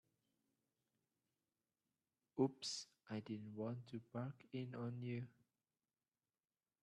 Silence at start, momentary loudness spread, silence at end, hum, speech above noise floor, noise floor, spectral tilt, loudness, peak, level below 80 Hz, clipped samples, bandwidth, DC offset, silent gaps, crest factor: 2.35 s; 10 LU; 1.55 s; none; over 43 dB; under -90 dBFS; -5.5 dB/octave; -48 LUFS; -28 dBFS; -88 dBFS; under 0.1%; 11.5 kHz; under 0.1%; none; 24 dB